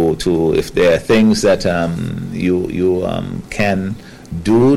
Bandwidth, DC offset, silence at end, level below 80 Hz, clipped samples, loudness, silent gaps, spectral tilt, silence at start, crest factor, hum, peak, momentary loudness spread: 15 kHz; under 0.1%; 0 s; -36 dBFS; under 0.1%; -16 LUFS; none; -6 dB/octave; 0 s; 10 dB; none; -6 dBFS; 11 LU